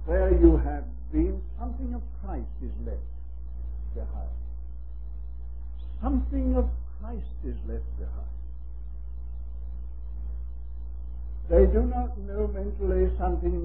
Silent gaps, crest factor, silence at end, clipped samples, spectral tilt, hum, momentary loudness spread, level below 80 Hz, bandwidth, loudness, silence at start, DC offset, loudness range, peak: none; 22 dB; 0 s; under 0.1%; -13.5 dB/octave; 60 Hz at -35 dBFS; 18 LU; -30 dBFS; 2.7 kHz; -29 LUFS; 0 s; 1%; 11 LU; -6 dBFS